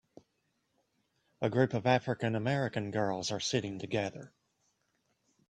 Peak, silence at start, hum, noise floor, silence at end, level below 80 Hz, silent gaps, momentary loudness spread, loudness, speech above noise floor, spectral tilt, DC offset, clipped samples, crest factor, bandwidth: -12 dBFS; 1.4 s; none; -79 dBFS; 1.2 s; -70 dBFS; none; 6 LU; -33 LUFS; 47 dB; -5.5 dB/octave; under 0.1%; under 0.1%; 22 dB; 10.5 kHz